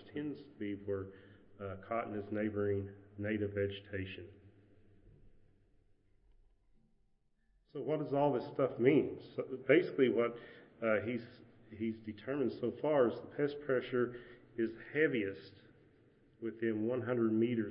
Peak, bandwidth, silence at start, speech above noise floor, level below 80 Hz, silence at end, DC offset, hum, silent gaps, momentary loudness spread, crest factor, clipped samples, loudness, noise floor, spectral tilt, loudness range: -14 dBFS; 5.6 kHz; 0 s; 38 dB; -72 dBFS; 0 s; under 0.1%; none; none; 16 LU; 24 dB; under 0.1%; -36 LUFS; -73 dBFS; -6 dB/octave; 10 LU